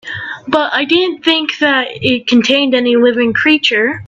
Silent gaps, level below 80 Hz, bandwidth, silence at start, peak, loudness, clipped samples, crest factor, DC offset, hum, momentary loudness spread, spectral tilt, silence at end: none; -56 dBFS; 8 kHz; 0.05 s; 0 dBFS; -12 LUFS; under 0.1%; 12 dB; under 0.1%; none; 5 LU; -4 dB/octave; 0 s